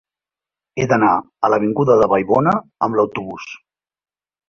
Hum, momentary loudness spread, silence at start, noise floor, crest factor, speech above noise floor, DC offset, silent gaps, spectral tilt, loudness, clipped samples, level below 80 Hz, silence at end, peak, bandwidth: none; 16 LU; 0.75 s; -89 dBFS; 16 dB; 73 dB; under 0.1%; none; -7.5 dB/octave; -16 LUFS; under 0.1%; -54 dBFS; 0.95 s; -2 dBFS; 7 kHz